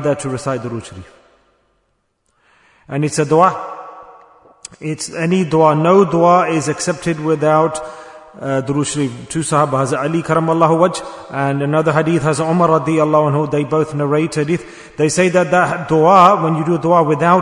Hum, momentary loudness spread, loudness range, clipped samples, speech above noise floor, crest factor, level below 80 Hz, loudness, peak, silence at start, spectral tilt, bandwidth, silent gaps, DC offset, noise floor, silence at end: none; 14 LU; 6 LU; under 0.1%; 51 dB; 16 dB; -52 dBFS; -15 LUFS; 0 dBFS; 0 s; -6 dB/octave; 11 kHz; none; under 0.1%; -65 dBFS; 0 s